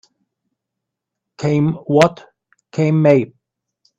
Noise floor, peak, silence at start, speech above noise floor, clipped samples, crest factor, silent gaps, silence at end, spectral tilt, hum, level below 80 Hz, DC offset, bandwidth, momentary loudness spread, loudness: -81 dBFS; 0 dBFS; 1.4 s; 66 dB; under 0.1%; 18 dB; none; 0.7 s; -7.5 dB/octave; none; -58 dBFS; under 0.1%; 8.4 kHz; 12 LU; -16 LUFS